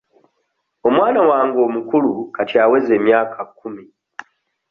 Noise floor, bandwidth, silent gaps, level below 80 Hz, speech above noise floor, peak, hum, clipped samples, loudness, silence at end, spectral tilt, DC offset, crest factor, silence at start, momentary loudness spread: -70 dBFS; 6.2 kHz; none; -62 dBFS; 55 dB; -2 dBFS; none; under 0.1%; -16 LUFS; 0.85 s; -7.5 dB/octave; under 0.1%; 16 dB; 0.85 s; 23 LU